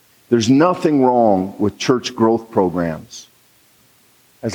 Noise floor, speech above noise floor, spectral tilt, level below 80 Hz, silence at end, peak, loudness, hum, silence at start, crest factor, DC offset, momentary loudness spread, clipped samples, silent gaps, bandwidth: -54 dBFS; 38 dB; -6 dB/octave; -58 dBFS; 0 s; -2 dBFS; -16 LUFS; none; 0.3 s; 16 dB; under 0.1%; 14 LU; under 0.1%; none; 19.5 kHz